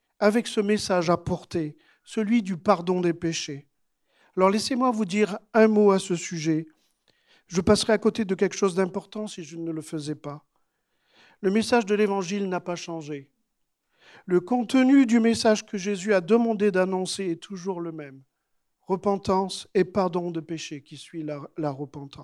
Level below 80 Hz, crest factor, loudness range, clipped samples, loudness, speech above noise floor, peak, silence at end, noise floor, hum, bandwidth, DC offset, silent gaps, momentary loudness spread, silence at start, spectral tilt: -58 dBFS; 20 dB; 6 LU; under 0.1%; -25 LUFS; 52 dB; -4 dBFS; 0 s; -76 dBFS; none; 12.5 kHz; under 0.1%; none; 15 LU; 0.2 s; -5.5 dB/octave